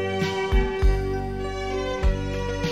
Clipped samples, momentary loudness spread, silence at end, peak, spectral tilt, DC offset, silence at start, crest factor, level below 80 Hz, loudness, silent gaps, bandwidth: under 0.1%; 5 LU; 0 s; -8 dBFS; -6 dB/octave; 0.3%; 0 s; 14 dB; -26 dBFS; -26 LUFS; none; 10 kHz